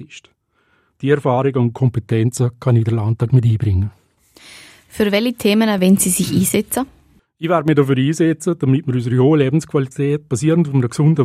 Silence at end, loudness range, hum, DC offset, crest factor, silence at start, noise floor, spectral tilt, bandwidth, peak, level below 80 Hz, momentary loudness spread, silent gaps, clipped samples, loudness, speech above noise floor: 0 s; 2 LU; none; under 0.1%; 16 dB; 0 s; -61 dBFS; -6 dB/octave; 16 kHz; 0 dBFS; -52 dBFS; 7 LU; none; under 0.1%; -16 LUFS; 45 dB